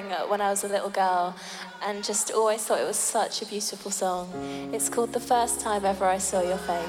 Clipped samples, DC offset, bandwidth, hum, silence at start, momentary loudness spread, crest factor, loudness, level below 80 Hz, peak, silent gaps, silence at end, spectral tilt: under 0.1%; under 0.1%; 18 kHz; none; 0 s; 8 LU; 16 dB; -26 LUFS; -58 dBFS; -10 dBFS; none; 0 s; -2.5 dB/octave